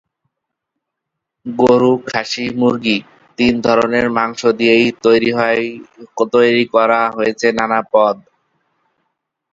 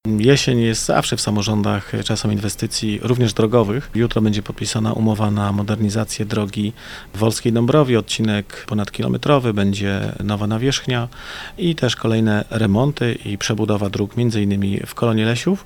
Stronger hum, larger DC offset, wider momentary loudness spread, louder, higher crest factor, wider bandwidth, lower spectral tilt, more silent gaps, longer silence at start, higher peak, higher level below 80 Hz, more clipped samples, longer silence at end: neither; neither; about the same, 9 LU vs 7 LU; first, -14 LUFS vs -19 LUFS; about the same, 16 dB vs 18 dB; second, 7.8 kHz vs 18.5 kHz; about the same, -5 dB/octave vs -5.5 dB/octave; neither; first, 1.45 s vs 0.05 s; about the same, 0 dBFS vs 0 dBFS; second, -52 dBFS vs -42 dBFS; neither; first, 1.35 s vs 0 s